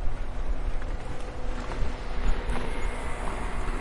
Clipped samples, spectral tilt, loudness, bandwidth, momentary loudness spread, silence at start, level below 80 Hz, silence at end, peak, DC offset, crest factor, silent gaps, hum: under 0.1%; -5.5 dB/octave; -35 LUFS; 11 kHz; 4 LU; 0 s; -30 dBFS; 0 s; -12 dBFS; under 0.1%; 14 dB; none; none